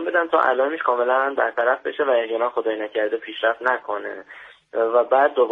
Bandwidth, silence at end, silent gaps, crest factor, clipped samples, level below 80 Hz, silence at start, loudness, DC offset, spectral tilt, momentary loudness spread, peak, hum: 4.6 kHz; 0 s; none; 16 dB; under 0.1%; -72 dBFS; 0 s; -21 LUFS; under 0.1%; -5 dB/octave; 11 LU; -4 dBFS; none